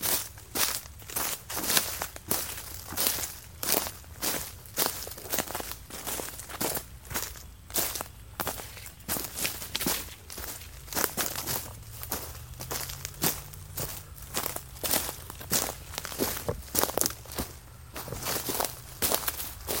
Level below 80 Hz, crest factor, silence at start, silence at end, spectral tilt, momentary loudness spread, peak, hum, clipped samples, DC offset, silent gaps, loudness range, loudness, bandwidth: -50 dBFS; 32 dB; 0 s; 0 s; -2 dB/octave; 12 LU; -2 dBFS; none; under 0.1%; under 0.1%; none; 4 LU; -31 LUFS; 17 kHz